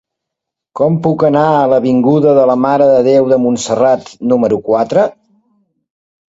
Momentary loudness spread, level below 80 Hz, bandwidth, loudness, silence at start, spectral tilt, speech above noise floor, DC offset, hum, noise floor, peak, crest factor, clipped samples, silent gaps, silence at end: 5 LU; -52 dBFS; 8 kHz; -11 LUFS; 0.75 s; -7 dB/octave; 69 dB; under 0.1%; none; -80 dBFS; 0 dBFS; 12 dB; under 0.1%; none; 1.2 s